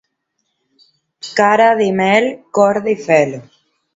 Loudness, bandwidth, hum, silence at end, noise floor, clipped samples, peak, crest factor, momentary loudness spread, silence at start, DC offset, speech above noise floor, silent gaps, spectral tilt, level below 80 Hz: -14 LUFS; 8 kHz; none; 0.55 s; -71 dBFS; under 0.1%; 0 dBFS; 16 dB; 10 LU; 1.25 s; under 0.1%; 57 dB; none; -5 dB/octave; -62 dBFS